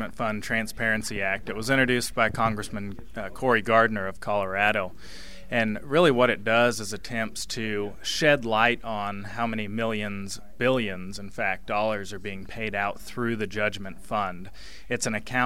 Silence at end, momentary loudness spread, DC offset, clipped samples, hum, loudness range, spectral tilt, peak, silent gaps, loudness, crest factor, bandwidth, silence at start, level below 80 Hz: 0 s; 15 LU; 1%; under 0.1%; none; 6 LU; -4.5 dB/octave; -4 dBFS; none; -26 LUFS; 22 dB; 16 kHz; 0 s; -50 dBFS